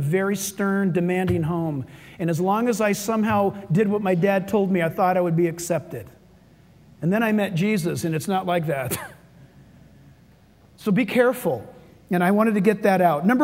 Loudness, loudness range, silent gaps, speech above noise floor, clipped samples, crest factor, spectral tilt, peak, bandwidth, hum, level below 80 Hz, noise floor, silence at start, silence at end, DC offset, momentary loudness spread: -22 LUFS; 5 LU; none; 32 dB; under 0.1%; 18 dB; -6.5 dB/octave; -4 dBFS; 16 kHz; none; -56 dBFS; -53 dBFS; 0 s; 0 s; under 0.1%; 10 LU